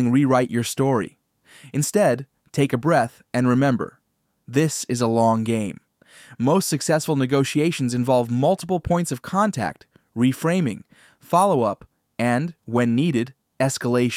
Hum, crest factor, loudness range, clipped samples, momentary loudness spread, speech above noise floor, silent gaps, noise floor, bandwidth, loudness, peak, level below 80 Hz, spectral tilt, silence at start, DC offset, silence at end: none; 16 dB; 2 LU; under 0.1%; 9 LU; 50 dB; none; -70 dBFS; 16 kHz; -21 LUFS; -4 dBFS; -54 dBFS; -6 dB/octave; 0 s; under 0.1%; 0 s